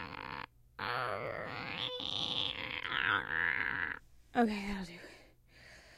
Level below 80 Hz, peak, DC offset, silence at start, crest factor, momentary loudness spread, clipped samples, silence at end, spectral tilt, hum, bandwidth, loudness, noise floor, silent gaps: -60 dBFS; -16 dBFS; under 0.1%; 0 s; 22 dB; 15 LU; under 0.1%; 0 s; -4.5 dB/octave; none; 15.5 kHz; -36 LUFS; -60 dBFS; none